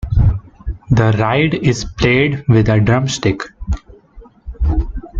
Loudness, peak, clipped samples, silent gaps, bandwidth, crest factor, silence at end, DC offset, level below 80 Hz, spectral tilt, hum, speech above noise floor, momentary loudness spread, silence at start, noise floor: -16 LUFS; -2 dBFS; under 0.1%; none; 7.8 kHz; 14 dB; 0 s; under 0.1%; -24 dBFS; -6.5 dB/octave; none; 27 dB; 13 LU; 0 s; -41 dBFS